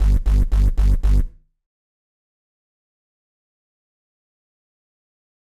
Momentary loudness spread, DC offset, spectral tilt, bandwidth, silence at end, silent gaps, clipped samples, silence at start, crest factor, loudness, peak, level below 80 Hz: 4 LU; under 0.1%; -7.5 dB/octave; 5.6 kHz; 4.25 s; none; under 0.1%; 0 s; 14 dB; -20 LUFS; -8 dBFS; -22 dBFS